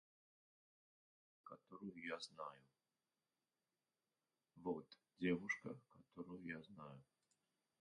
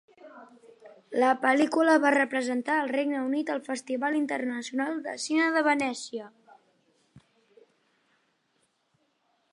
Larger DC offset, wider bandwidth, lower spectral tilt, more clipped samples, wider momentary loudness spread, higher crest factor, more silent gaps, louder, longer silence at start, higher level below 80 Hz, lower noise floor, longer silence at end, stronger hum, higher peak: neither; second, 10 kHz vs 11.5 kHz; first, -5.5 dB/octave vs -3 dB/octave; neither; first, 21 LU vs 11 LU; about the same, 24 dB vs 20 dB; neither; second, -49 LUFS vs -26 LUFS; first, 1.45 s vs 0.25 s; about the same, -84 dBFS vs -82 dBFS; first, under -90 dBFS vs -73 dBFS; second, 0.8 s vs 2.35 s; neither; second, -28 dBFS vs -8 dBFS